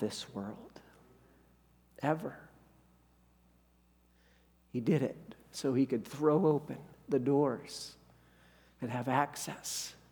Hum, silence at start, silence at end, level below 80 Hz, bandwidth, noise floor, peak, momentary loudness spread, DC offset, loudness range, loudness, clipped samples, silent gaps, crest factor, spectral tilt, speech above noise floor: 60 Hz at -65 dBFS; 0 s; 0.2 s; -70 dBFS; over 20 kHz; -68 dBFS; -14 dBFS; 17 LU; under 0.1%; 11 LU; -34 LUFS; under 0.1%; none; 24 dB; -5.5 dB/octave; 34 dB